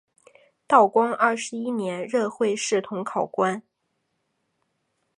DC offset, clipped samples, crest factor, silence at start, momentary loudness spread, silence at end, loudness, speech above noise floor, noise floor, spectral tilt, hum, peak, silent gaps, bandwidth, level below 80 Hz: under 0.1%; under 0.1%; 22 dB; 0.7 s; 10 LU; 1.6 s; -23 LUFS; 53 dB; -75 dBFS; -4 dB/octave; none; -4 dBFS; none; 11 kHz; -78 dBFS